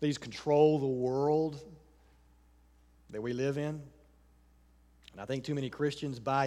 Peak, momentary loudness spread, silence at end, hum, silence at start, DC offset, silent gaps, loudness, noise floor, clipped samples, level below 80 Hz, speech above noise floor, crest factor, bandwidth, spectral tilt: -14 dBFS; 19 LU; 0 s; none; 0 s; under 0.1%; none; -32 LUFS; -63 dBFS; under 0.1%; -64 dBFS; 32 dB; 20 dB; 11.5 kHz; -6.5 dB/octave